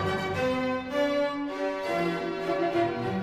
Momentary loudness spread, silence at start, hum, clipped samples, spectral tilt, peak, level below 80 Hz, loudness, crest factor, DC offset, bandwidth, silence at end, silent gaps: 4 LU; 0 s; none; under 0.1%; -6 dB/octave; -14 dBFS; -58 dBFS; -28 LUFS; 14 dB; under 0.1%; 15.5 kHz; 0 s; none